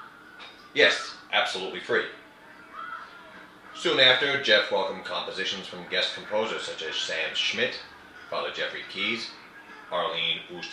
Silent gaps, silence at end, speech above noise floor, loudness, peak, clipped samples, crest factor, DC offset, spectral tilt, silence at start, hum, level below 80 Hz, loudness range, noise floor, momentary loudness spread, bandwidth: none; 0 s; 23 dB; -26 LUFS; -4 dBFS; under 0.1%; 24 dB; under 0.1%; -2 dB/octave; 0 s; none; -72 dBFS; 6 LU; -49 dBFS; 24 LU; 12 kHz